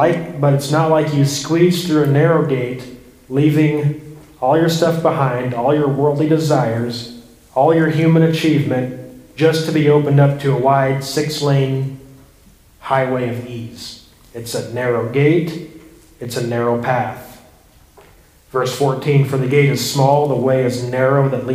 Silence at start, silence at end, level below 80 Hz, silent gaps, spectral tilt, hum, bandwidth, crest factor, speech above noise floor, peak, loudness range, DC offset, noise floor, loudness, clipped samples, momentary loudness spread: 0 s; 0 s; -52 dBFS; none; -6.5 dB/octave; none; 15.5 kHz; 16 dB; 33 dB; 0 dBFS; 6 LU; under 0.1%; -48 dBFS; -16 LUFS; under 0.1%; 15 LU